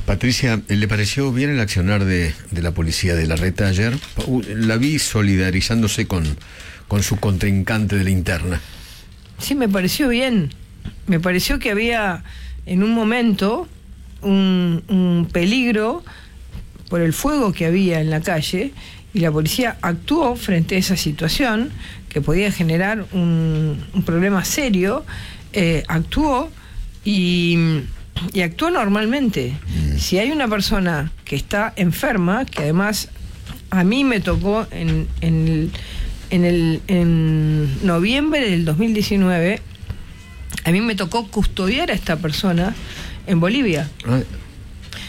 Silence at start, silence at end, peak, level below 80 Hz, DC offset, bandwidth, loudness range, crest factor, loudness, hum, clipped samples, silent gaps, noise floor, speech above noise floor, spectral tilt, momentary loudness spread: 0 s; 0 s; -6 dBFS; -32 dBFS; under 0.1%; 16.5 kHz; 2 LU; 12 dB; -19 LUFS; none; under 0.1%; none; -40 dBFS; 22 dB; -5.5 dB/octave; 13 LU